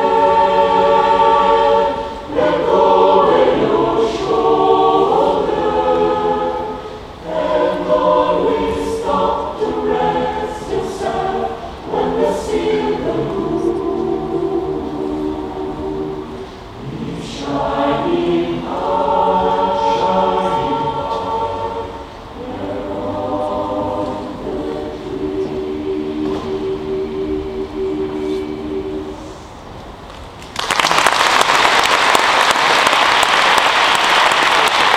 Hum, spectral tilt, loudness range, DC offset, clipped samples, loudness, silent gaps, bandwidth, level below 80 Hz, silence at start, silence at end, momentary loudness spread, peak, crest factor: none; -3.5 dB/octave; 10 LU; under 0.1%; under 0.1%; -16 LUFS; none; 17 kHz; -40 dBFS; 0 s; 0 s; 14 LU; 0 dBFS; 16 dB